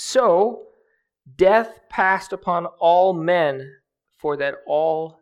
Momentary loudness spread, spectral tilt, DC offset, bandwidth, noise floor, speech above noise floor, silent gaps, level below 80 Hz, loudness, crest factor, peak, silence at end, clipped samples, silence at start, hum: 11 LU; -4.5 dB/octave; under 0.1%; 13 kHz; -65 dBFS; 46 dB; none; -58 dBFS; -20 LUFS; 18 dB; -2 dBFS; 0.1 s; under 0.1%; 0 s; none